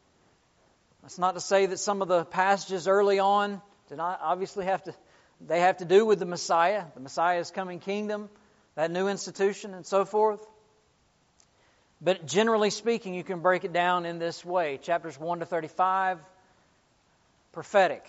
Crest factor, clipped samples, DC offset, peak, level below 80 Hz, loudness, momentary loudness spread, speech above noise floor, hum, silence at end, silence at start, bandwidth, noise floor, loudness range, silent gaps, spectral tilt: 20 dB; under 0.1%; under 0.1%; -8 dBFS; -76 dBFS; -27 LUFS; 11 LU; 40 dB; none; 0.1 s; 1.05 s; 8 kHz; -67 dBFS; 4 LU; none; -3 dB/octave